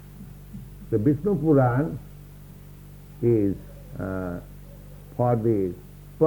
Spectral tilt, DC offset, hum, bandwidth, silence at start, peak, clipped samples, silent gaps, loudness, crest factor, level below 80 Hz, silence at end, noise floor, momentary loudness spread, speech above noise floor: -10 dB/octave; under 0.1%; none; 19.5 kHz; 0 s; -8 dBFS; under 0.1%; none; -24 LUFS; 18 dB; -46 dBFS; 0 s; -44 dBFS; 25 LU; 21 dB